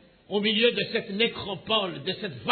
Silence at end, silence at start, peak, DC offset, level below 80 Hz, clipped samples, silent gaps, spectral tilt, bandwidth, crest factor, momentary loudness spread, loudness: 0 s; 0.3 s; -8 dBFS; under 0.1%; -64 dBFS; under 0.1%; none; -7.5 dB/octave; 4.6 kHz; 18 dB; 10 LU; -26 LUFS